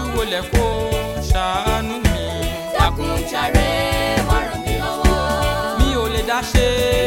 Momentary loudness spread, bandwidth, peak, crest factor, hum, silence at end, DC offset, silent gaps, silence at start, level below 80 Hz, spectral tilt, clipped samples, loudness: 5 LU; 17 kHz; -2 dBFS; 18 dB; none; 0 s; under 0.1%; none; 0 s; -24 dBFS; -5 dB/octave; under 0.1%; -19 LUFS